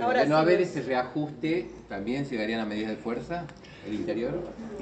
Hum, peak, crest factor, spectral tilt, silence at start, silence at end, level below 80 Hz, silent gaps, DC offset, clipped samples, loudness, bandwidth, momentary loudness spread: none; -10 dBFS; 18 dB; -6.5 dB/octave; 0 s; 0 s; -56 dBFS; none; under 0.1%; under 0.1%; -29 LUFS; 8.8 kHz; 14 LU